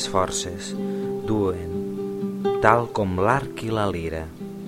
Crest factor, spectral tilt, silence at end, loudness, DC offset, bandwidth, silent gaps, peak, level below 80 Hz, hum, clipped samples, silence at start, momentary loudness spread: 24 dB; -5 dB/octave; 0 s; -24 LUFS; under 0.1%; 16.5 kHz; none; 0 dBFS; -46 dBFS; none; under 0.1%; 0 s; 11 LU